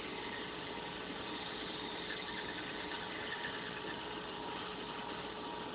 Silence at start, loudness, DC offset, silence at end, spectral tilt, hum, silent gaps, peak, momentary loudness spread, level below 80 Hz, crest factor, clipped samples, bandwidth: 0 s; -42 LUFS; under 0.1%; 0 s; -1.5 dB/octave; none; none; -30 dBFS; 2 LU; -66 dBFS; 14 dB; under 0.1%; 4 kHz